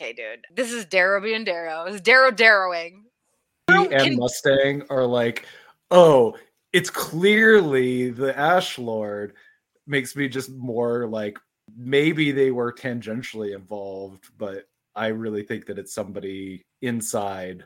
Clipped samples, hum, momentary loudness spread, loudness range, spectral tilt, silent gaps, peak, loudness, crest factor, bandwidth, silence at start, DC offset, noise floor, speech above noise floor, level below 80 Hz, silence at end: under 0.1%; none; 19 LU; 12 LU; -4.5 dB/octave; none; 0 dBFS; -20 LUFS; 20 dB; 17 kHz; 0 s; under 0.1%; -73 dBFS; 52 dB; -66 dBFS; 0.05 s